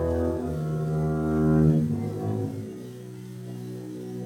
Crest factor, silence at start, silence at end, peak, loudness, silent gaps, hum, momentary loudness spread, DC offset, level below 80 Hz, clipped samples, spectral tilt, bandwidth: 18 dB; 0 s; 0 s; -8 dBFS; -26 LUFS; none; none; 18 LU; under 0.1%; -46 dBFS; under 0.1%; -9.5 dB/octave; 12.5 kHz